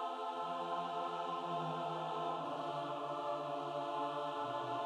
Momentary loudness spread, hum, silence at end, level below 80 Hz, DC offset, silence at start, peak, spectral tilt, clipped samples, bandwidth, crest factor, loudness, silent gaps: 1 LU; none; 0 s; under -90 dBFS; under 0.1%; 0 s; -28 dBFS; -5.5 dB/octave; under 0.1%; 12 kHz; 12 dB; -41 LUFS; none